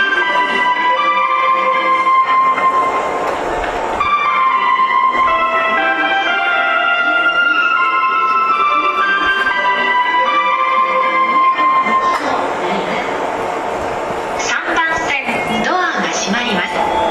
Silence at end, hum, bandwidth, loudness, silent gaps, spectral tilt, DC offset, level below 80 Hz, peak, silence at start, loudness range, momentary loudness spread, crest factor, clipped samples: 0 s; none; 12.5 kHz; -14 LUFS; none; -2.5 dB/octave; under 0.1%; -46 dBFS; -4 dBFS; 0 s; 4 LU; 6 LU; 10 dB; under 0.1%